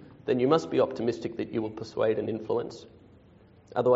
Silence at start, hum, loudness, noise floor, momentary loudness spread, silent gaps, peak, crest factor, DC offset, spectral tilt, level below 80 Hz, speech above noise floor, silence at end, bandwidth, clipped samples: 0 s; none; -29 LUFS; -56 dBFS; 11 LU; none; -8 dBFS; 22 dB; under 0.1%; -6 dB/octave; -64 dBFS; 28 dB; 0 s; 8 kHz; under 0.1%